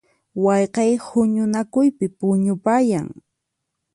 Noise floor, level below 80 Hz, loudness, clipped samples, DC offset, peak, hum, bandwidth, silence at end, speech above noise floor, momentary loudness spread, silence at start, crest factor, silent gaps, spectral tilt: -78 dBFS; -62 dBFS; -19 LUFS; under 0.1%; under 0.1%; -6 dBFS; none; 11.5 kHz; 0.85 s; 60 dB; 5 LU; 0.35 s; 14 dB; none; -7 dB/octave